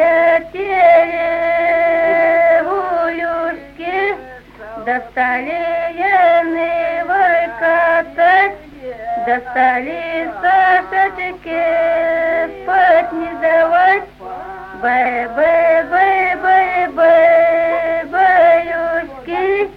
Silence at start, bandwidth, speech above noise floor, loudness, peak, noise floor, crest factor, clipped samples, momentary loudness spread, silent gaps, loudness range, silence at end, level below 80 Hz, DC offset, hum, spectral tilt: 0 s; 5.4 kHz; 19 dB; -14 LUFS; -2 dBFS; -34 dBFS; 14 dB; under 0.1%; 10 LU; none; 4 LU; 0 s; -48 dBFS; under 0.1%; none; -5.5 dB/octave